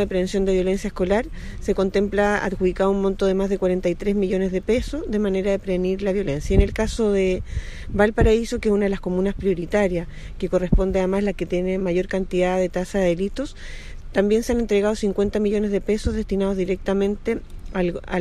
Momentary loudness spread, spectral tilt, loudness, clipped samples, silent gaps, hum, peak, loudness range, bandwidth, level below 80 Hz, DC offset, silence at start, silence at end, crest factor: 7 LU; -6.5 dB/octave; -22 LUFS; under 0.1%; none; none; -2 dBFS; 2 LU; 12.5 kHz; -30 dBFS; under 0.1%; 0 s; 0 s; 18 dB